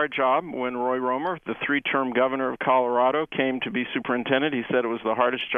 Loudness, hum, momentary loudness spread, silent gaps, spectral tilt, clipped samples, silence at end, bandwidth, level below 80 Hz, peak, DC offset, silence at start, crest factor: -24 LUFS; none; 5 LU; none; -7.5 dB/octave; under 0.1%; 0 s; 3.8 kHz; -64 dBFS; -6 dBFS; under 0.1%; 0 s; 18 dB